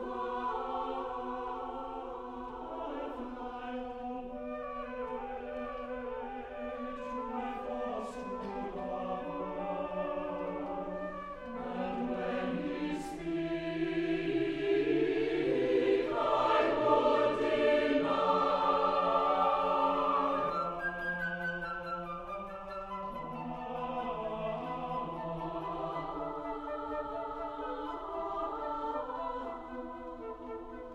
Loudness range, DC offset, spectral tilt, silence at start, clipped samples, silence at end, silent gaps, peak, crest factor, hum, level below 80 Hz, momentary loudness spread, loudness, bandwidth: 11 LU; under 0.1%; -6.5 dB/octave; 0 s; under 0.1%; 0 s; none; -14 dBFS; 20 dB; none; -56 dBFS; 13 LU; -35 LUFS; 11 kHz